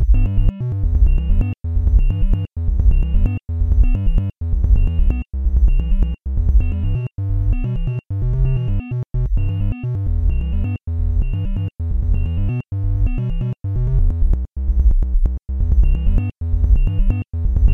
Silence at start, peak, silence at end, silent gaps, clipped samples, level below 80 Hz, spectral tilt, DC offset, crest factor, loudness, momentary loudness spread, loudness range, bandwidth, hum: 0 s; -2 dBFS; 0 s; none; under 0.1%; -16 dBFS; -10 dB/octave; 0.7%; 14 dB; -20 LUFS; 5 LU; 3 LU; 3 kHz; none